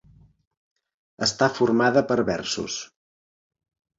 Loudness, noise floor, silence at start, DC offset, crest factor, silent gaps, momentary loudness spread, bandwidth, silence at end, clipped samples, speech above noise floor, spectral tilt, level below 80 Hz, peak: -23 LUFS; under -90 dBFS; 1.2 s; under 0.1%; 20 dB; none; 12 LU; 7.8 kHz; 1.15 s; under 0.1%; over 68 dB; -4 dB/octave; -58 dBFS; -4 dBFS